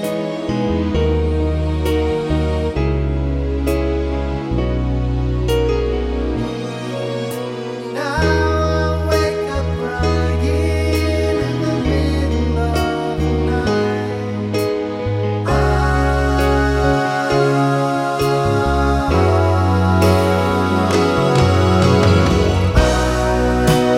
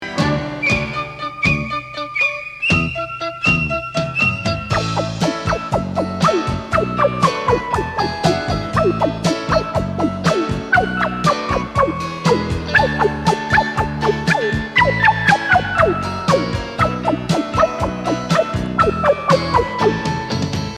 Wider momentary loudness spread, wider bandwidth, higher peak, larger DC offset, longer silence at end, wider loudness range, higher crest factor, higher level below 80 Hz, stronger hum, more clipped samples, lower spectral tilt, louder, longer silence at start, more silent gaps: about the same, 7 LU vs 6 LU; first, 16 kHz vs 13.5 kHz; about the same, -2 dBFS vs 0 dBFS; neither; about the same, 0 s vs 0 s; about the same, 5 LU vs 3 LU; about the same, 14 dB vs 18 dB; first, -24 dBFS vs -36 dBFS; neither; neither; about the same, -6.5 dB/octave vs -5.5 dB/octave; about the same, -17 LUFS vs -17 LUFS; about the same, 0 s vs 0 s; neither